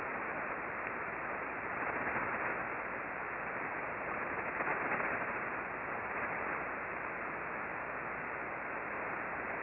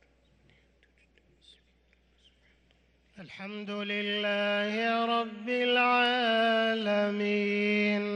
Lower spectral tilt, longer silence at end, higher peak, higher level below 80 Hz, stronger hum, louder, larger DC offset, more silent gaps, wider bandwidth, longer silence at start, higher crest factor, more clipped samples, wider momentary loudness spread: about the same, -4.5 dB/octave vs -5.5 dB/octave; about the same, 0 s vs 0 s; second, -22 dBFS vs -16 dBFS; first, -66 dBFS vs -74 dBFS; neither; second, -38 LUFS vs -28 LUFS; neither; neither; second, 5.4 kHz vs 9.8 kHz; second, 0 s vs 3.15 s; about the same, 16 dB vs 16 dB; neither; second, 4 LU vs 12 LU